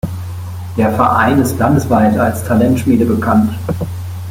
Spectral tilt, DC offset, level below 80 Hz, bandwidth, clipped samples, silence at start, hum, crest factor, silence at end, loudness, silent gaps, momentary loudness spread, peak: -7 dB/octave; under 0.1%; -40 dBFS; 16.5 kHz; under 0.1%; 0.05 s; none; 14 dB; 0 s; -13 LUFS; none; 12 LU; 0 dBFS